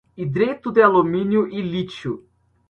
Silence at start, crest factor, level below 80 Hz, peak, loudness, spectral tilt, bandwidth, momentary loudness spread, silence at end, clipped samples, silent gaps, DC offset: 0.15 s; 18 dB; -56 dBFS; -2 dBFS; -20 LUFS; -8 dB/octave; 6.8 kHz; 15 LU; 0.5 s; under 0.1%; none; under 0.1%